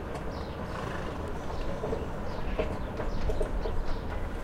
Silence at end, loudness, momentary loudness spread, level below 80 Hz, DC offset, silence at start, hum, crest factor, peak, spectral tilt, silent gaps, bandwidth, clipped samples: 0 s; -35 LUFS; 4 LU; -34 dBFS; under 0.1%; 0 s; none; 16 dB; -16 dBFS; -6.5 dB/octave; none; 11.5 kHz; under 0.1%